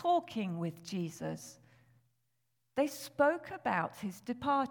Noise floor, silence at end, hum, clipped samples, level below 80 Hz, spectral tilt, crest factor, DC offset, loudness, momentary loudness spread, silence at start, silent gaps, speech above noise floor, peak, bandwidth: -83 dBFS; 0 s; none; under 0.1%; -74 dBFS; -5.5 dB/octave; 20 dB; under 0.1%; -35 LUFS; 11 LU; 0 s; none; 48 dB; -16 dBFS; 19 kHz